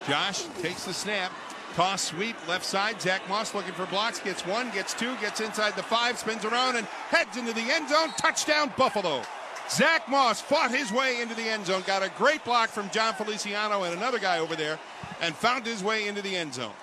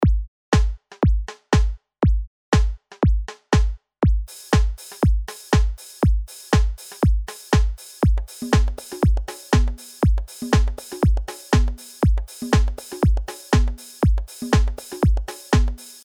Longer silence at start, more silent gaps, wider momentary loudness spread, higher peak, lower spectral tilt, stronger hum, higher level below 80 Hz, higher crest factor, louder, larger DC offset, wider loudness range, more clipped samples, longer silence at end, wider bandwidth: about the same, 0 s vs 0 s; second, none vs 0.28-0.52 s, 2.27-2.52 s; about the same, 8 LU vs 6 LU; second, -10 dBFS vs -4 dBFS; second, -2.5 dB/octave vs -6 dB/octave; neither; second, -70 dBFS vs -22 dBFS; about the same, 18 dB vs 16 dB; second, -27 LUFS vs -22 LUFS; neither; first, 4 LU vs 0 LU; neither; about the same, 0 s vs 0.1 s; second, 13.5 kHz vs 15.5 kHz